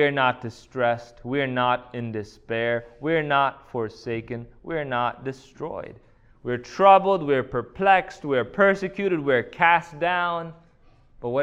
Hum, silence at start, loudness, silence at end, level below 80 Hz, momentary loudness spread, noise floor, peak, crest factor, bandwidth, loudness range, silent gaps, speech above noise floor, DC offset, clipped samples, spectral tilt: none; 0 s; -23 LUFS; 0 s; -56 dBFS; 15 LU; -55 dBFS; -4 dBFS; 20 dB; 8.4 kHz; 6 LU; none; 32 dB; under 0.1%; under 0.1%; -6.5 dB/octave